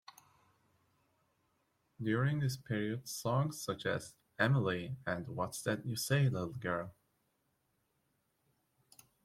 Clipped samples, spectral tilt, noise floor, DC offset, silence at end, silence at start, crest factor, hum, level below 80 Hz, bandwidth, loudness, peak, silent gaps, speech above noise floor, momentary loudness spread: under 0.1%; -5.5 dB/octave; -80 dBFS; under 0.1%; 2.3 s; 2 s; 22 dB; none; -70 dBFS; 16 kHz; -36 LUFS; -16 dBFS; none; 44 dB; 8 LU